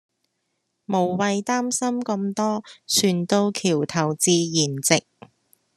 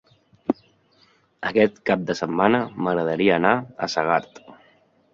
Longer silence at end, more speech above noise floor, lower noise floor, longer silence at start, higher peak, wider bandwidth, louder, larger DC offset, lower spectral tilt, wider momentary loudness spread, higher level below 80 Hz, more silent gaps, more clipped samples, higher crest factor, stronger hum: first, 0.75 s vs 0.6 s; first, 53 dB vs 39 dB; first, -75 dBFS vs -60 dBFS; first, 0.9 s vs 0.5 s; about the same, 0 dBFS vs -2 dBFS; first, 13 kHz vs 7.6 kHz; about the same, -22 LUFS vs -22 LUFS; neither; second, -4 dB/octave vs -6 dB/octave; second, 6 LU vs 9 LU; second, -68 dBFS vs -60 dBFS; neither; neither; about the same, 22 dB vs 22 dB; neither